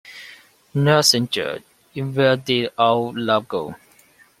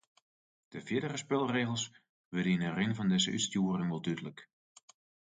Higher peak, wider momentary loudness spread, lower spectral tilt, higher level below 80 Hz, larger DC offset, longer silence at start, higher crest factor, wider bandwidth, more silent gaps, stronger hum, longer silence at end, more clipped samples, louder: first, -2 dBFS vs -18 dBFS; first, 19 LU vs 11 LU; about the same, -4 dB/octave vs -4.5 dB/octave; first, -60 dBFS vs -70 dBFS; neither; second, 0.05 s vs 0.7 s; about the same, 20 dB vs 18 dB; first, 16 kHz vs 9.6 kHz; second, none vs 2.09-2.31 s; neither; second, 0.65 s vs 0.85 s; neither; first, -19 LUFS vs -33 LUFS